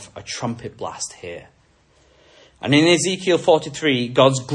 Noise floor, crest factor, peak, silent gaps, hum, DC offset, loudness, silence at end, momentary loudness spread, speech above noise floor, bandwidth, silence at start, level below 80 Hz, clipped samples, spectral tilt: -57 dBFS; 20 dB; 0 dBFS; none; none; under 0.1%; -19 LUFS; 0 s; 16 LU; 38 dB; 11.5 kHz; 0 s; -60 dBFS; under 0.1%; -4.5 dB/octave